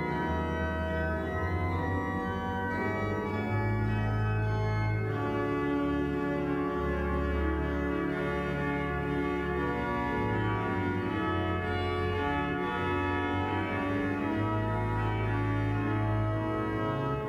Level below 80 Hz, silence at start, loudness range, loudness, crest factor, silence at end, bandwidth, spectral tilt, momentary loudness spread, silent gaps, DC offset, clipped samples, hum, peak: -42 dBFS; 0 s; 1 LU; -31 LUFS; 12 dB; 0 s; 7.8 kHz; -8 dB/octave; 2 LU; none; under 0.1%; under 0.1%; none; -18 dBFS